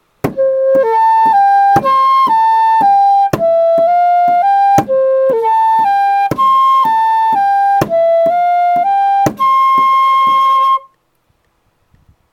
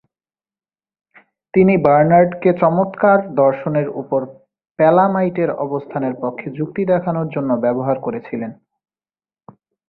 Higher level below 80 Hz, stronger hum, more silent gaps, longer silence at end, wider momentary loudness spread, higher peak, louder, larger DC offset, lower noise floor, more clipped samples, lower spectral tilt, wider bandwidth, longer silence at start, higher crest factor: first, -50 dBFS vs -56 dBFS; neither; second, none vs 4.71-4.75 s; first, 1.55 s vs 1.35 s; second, 3 LU vs 12 LU; about the same, 0 dBFS vs 0 dBFS; first, -10 LUFS vs -17 LUFS; neither; second, -60 dBFS vs under -90 dBFS; neither; second, -5.5 dB/octave vs -12.5 dB/octave; first, 17 kHz vs 4.6 kHz; second, 0.25 s vs 1.55 s; second, 10 dB vs 18 dB